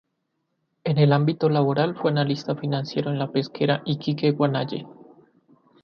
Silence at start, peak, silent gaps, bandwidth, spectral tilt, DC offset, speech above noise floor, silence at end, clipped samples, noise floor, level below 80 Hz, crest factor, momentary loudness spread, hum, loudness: 0.85 s; -6 dBFS; none; 6.6 kHz; -8 dB/octave; under 0.1%; 53 dB; 0.9 s; under 0.1%; -76 dBFS; -66 dBFS; 18 dB; 7 LU; none; -23 LUFS